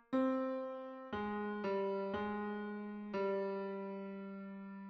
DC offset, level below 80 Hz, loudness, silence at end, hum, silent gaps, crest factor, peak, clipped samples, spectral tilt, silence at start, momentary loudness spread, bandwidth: under 0.1%; -74 dBFS; -41 LUFS; 0 s; none; none; 16 dB; -24 dBFS; under 0.1%; -5.5 dB/octave; 0.1 s; 11 LU; 6.2 kHz